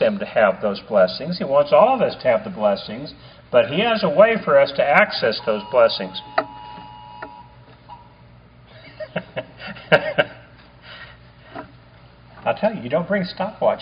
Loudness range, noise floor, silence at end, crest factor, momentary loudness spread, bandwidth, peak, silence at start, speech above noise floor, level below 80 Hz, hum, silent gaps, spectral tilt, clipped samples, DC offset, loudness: 10 LU; -47 dBFS; 0 s; 20 dB; 23 LU; 5.2 kHz; 0 dBFS; 0 s; 29 dB; -54 dBFS; 60 Hz at -50 dBFS; none; -3 dB/octave; under 0.1%; under 0.1%; -19 LUFS